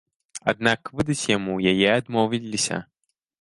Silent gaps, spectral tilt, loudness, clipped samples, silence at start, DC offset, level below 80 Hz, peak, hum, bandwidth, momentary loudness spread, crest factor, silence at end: none; -4 dB/octave; -23 LUFS; under 0.1%; 0.35 s; under 0.1%; -56 dBFS; -2 dBFS; none; 11.5 kHz; 7 LU; 22 dB; 0.6 s